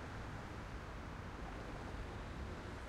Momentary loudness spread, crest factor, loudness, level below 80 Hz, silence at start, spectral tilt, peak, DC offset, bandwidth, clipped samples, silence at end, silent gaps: 1 LU; 12 dB; -49 LUFS; -52 dBFS; 0 s; -6 dB/octave; -36 dBFS; under 0.1%; 15 kHz; under 0.1%; 0 s; none